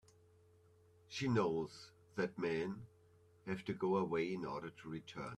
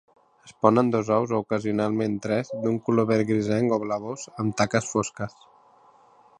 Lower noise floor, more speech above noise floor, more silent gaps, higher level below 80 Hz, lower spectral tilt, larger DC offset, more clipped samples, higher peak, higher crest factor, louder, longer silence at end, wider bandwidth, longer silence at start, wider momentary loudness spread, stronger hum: first, -68 dBFS vs -56 dBFS; second, 28 dB vs 32 dB; neither; second, -76 dBFS vs -60 dBFS; about the same, -6.5 dB/octave vs -6 dB/octave; neither; neither; second, -22 dBFS vs -2 dBFS; about the same, 20 dB vs 22 dB; second, -41 LUFS vs -25 LUFS; second, 0 s vs 1.1 s; first, 12 kHz vs 10.5 kHz; first, 1.1 s vs 0.45 s; first, 13 LU vs 8 LU; neither